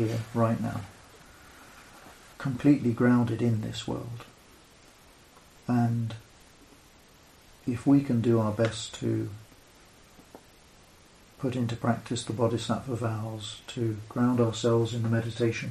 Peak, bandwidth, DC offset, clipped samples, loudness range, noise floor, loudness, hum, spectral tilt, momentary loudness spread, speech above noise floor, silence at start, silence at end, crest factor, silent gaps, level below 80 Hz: -10 dBFS; 13 kHz; under 0.1%; under 0.1%; 6 LU; -56 dBFS; -28 LUFS; none; -7 dB/octave; 20 LU; 29 dB; 0 s; 0 s; 20 dB; none; -60 dBFS